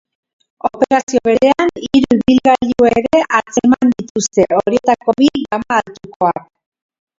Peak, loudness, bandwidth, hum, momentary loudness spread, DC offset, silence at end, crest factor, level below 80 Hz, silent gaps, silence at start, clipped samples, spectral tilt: 0 dBFS; -14 LUFS; 7.8 kHz; none; 6 LU; under 0.1%; 0.8 s; 14 dB; -46 dBFS; 1.03-1.07 s, 4.10-4.15 s, 6.16-6.20 s; 0.65 s; under 0.1%; -4.5 dB/octave